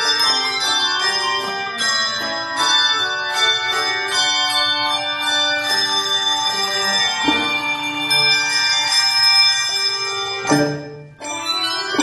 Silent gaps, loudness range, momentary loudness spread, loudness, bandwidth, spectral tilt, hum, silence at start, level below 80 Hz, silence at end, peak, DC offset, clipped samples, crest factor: none; 2 LU; 8 LU; -16 LUFS; 16 kHz; -1 dB/octave; none; 0 s; -60 dBFS; 0 s; -2 dBFS; under 0.1%; under 0.1%; 16 dB